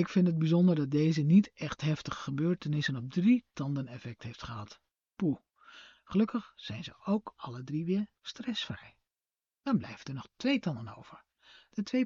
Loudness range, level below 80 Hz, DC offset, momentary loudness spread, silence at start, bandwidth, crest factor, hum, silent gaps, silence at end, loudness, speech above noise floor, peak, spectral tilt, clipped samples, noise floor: 8 LU; -66 dBFS; under 0.1%; 17 LU; 0 s; 7.4 kHz; 18 dB; none; none; 0 s; -32 LUFS; over 59 dB; -14 dBFS; -6.5 dB/octave; under 0.1%; under -90 dBFS